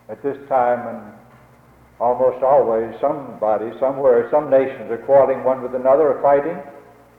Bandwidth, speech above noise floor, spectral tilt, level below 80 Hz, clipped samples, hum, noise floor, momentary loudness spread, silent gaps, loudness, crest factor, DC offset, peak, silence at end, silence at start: 4 kHz; 32 dB; -8.5 dB/octave; -58 dBFS; under 0.1%; none; -49 dBFS; 12 LU; none; -18 LUFS; 14 dB; under 0.1%; -4 dBFS; 0.4 s; 0.1 s